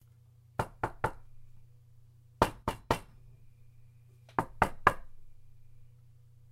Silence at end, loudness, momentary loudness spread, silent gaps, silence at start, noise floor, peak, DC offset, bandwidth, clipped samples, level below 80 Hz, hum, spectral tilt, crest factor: 0.7 s; -33 LUFS; 11 LU; none; 0.6 s; -60 dBFS; -6 dBFS; under 0.1%; 16 kHz; under 0.1%; -50 dBFS; none; -5.5 dB/octave; 30 dB